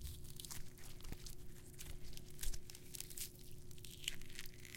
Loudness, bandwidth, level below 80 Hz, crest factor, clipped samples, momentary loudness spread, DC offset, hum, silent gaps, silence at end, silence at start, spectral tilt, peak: -51 LUFS; 17 kHz; -52 dBFS; 24 dB; under 0.1%; 10 LU; under 0.1%; none; none; 0 s; 0 s; -2.5 dB/octave; -22 dBFS